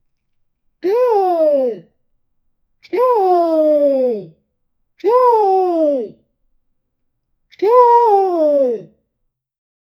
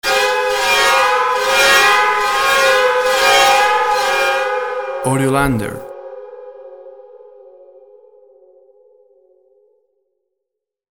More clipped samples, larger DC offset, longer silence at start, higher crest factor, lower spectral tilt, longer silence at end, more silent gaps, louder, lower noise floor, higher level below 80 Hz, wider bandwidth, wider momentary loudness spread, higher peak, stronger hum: neither; neither; first, 0.85 s vs 0.05 s; about the same, 16 dB vs 16 dB; first, -7 dB/octave vs -2.5 dB/octave; second, 1.15 s vs 3.8 s; neither; about the same, -14 LUFS vs -13 LUFS; second, -72 dBFS vs -79 dBFS; second, -70 dBFS vs -44 dBFS; second, 14 kHz vs over 20 kHz; second, 12 LU vs 19 LU; about the same, 0 dBFS vs -2 dBFS; neither